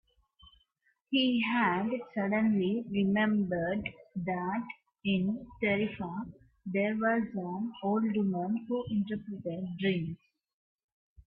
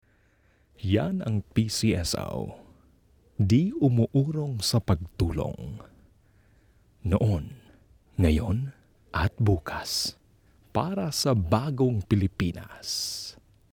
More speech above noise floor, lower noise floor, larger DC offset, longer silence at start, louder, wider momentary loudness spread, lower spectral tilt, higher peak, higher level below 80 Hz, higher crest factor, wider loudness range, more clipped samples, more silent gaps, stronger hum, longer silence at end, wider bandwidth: first, 44 dB vs 38 dB; first, -75 dBFS vs -63 dBFS; neither; second, 0.45 s vs 0.8 s; second, -32 LUFS vs -27 LUFS; about the same, 11 LU vs 13 LU; first, -10 dB/octave vs -5.5 dB/octave; second, -16 dBFS vs -8 dBFS; second, -66 dBFS vs -44 dBFS; about the same, 16 dB vs 20 dB; about the same, 4 LU vs 3 LU; neither; first, 10.54-10.76 s, 10.84-11.16 s vs none; neither; second, 0.05 s vs 0.4 s; second, 5.2 kHz vs 20 kHz